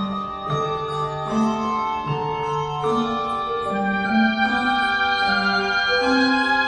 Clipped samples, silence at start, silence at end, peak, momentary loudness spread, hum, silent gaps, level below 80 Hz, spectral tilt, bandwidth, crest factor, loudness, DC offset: under 0.1%; 0 s; 0 s; -8 dBFS; 7 LU; none; none; -48 dBFS; -5 dB/octave; 10.5 kHz; 14 dB; -21 LUFS; under 0.1%